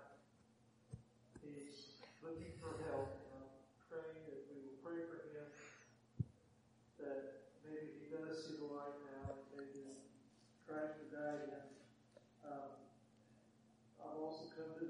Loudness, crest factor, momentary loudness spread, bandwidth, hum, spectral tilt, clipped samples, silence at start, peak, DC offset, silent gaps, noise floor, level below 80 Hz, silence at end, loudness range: -52 LUFS; 24 dB; 18 LU; 10.5 kHz; none; -6.5 dB/octave; under 0.1%; 0 s; -30 dBFS; under 0.1%; none; -72 dBFS; -76 dBFS; 0 s; 3 LU